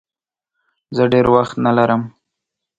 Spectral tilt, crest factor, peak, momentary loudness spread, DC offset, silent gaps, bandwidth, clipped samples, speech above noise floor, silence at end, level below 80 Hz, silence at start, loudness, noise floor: -8 dB/octave; 18 dB; 0 dBFS; 11 LU; under 0.1%; none; 7.8 kHz; under 0.1%; 75 dB; 0.7 s; -50 dBFS; 0.9 s; -15 LUFS; -89 dBFS